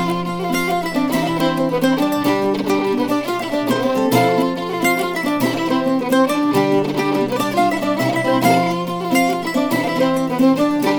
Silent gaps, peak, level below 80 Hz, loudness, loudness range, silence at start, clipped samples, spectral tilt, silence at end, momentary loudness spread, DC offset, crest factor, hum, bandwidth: none; -2 dBFS; -52 dBFS; -18 LUFS; 1 LU; 0 s; under 0.1%; -5.5 dB/octave; 0 s; 4 LU; 0.3%; 16 dB; none; over 20 kHz